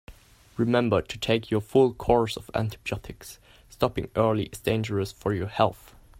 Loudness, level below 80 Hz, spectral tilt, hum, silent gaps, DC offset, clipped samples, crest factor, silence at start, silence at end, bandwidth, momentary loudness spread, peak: -26 LUFS; -48 dBFS; -6.5 dB/octave; none; none; under 0.1%; under 0.1%; 20 dB; 0.1 s; 0.45 s; 16 kHz; 11 LU; -6 dBFS